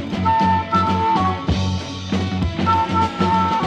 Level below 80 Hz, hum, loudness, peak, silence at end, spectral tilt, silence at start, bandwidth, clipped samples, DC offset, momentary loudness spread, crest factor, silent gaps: -36 dBFS; none; -19 LUFS; -6 dBFS; 0 s; -6.5 dB/octave; 0 s; 9.2 kHz; under 0.1%; under 0.1%; 6 LU; 14 dB; none